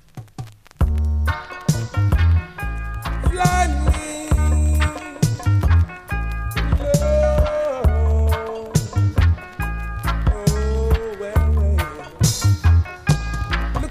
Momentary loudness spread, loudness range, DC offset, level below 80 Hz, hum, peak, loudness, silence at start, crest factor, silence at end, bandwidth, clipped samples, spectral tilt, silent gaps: 9 LU; 2 LU; under 0.1%; -22 dBFS; none; -2 dBFS; -20 LUFS; 0.15 s; 16 dB; 0 s; 15.5 kHz; under 0.1%; -6 dB/octave; none